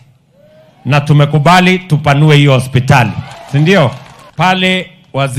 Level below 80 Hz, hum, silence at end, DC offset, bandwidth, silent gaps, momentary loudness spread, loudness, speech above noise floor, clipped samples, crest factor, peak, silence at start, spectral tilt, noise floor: -42 dBFS; none; 0 s; under 0.1%; 13 kHz; none; 13 LU; -10 LUFS; 37 dB; under 0.1%; 10 dB; 0 dBFS; 0.85 s; -6 dB/octave; -46 dBFS